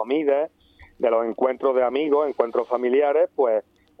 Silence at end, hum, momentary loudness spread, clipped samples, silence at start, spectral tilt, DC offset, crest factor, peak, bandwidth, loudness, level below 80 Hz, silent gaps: 0.4 s; none; 4 LU; under 0.1%; 0 s; -7 dB/octave; under 0.1%; 18 dB; -4 dBFS; 5 kHz; -22 LUFS; -64 dBFS; none